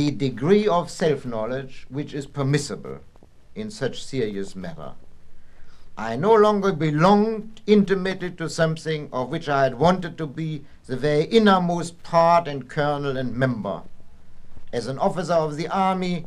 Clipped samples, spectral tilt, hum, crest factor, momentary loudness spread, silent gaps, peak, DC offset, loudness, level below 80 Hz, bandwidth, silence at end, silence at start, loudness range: under 0.1%; -6.5 dB/octave; none; 20 dB; 16 LU; none; -2 dBFS; under 0.1%; -22 LUFS; -46 dBFS; 12 kHz; 0 s; 0 s; 9 LU